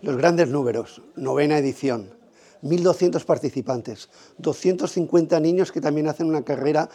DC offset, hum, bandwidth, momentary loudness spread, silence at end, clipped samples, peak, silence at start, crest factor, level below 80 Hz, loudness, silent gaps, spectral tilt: under 0.1%; none; 11.5 kHz; 11 LU; 0.05 s; under 0.1%; -4 dBFS; 0.05 s; 18 dB; -72 dBFS; -22 LUFS; none; -6.5 dB/octave